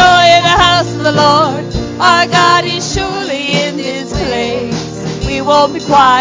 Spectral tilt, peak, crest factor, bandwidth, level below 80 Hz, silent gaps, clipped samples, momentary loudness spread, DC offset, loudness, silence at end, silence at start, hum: -4 dB/octave; 0 dBFS; 10 dB; 7.8 kHz; -30 dBFS; none; 0.1%; 12 LU; under 0.1%; -11 LUFS; 0 s; 0 s; none